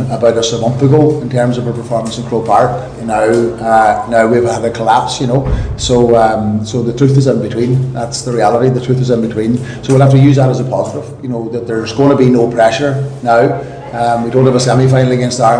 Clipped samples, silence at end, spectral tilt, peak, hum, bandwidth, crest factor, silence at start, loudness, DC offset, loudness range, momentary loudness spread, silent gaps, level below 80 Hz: 0.8%; 0 s; -6.5 dB/octave; 0 dBFS; none; 10 kHz; 10 dB; 0 s; -12 LUFS; under 0.1%; 2 LU; 8 LU; none; -32 dBFS